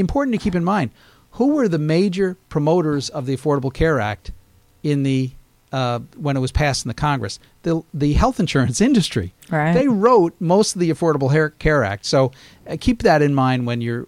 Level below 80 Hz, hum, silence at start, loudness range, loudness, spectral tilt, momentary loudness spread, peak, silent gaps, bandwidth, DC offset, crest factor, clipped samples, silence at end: -34 dBFS; none; 0 s; 5 LU; -19 LUFS; -6 dB/octave; 9 LU; -2 dBFS; none; 14 kHz; under 0.1%; 16 dB; under 0.1%; 0 s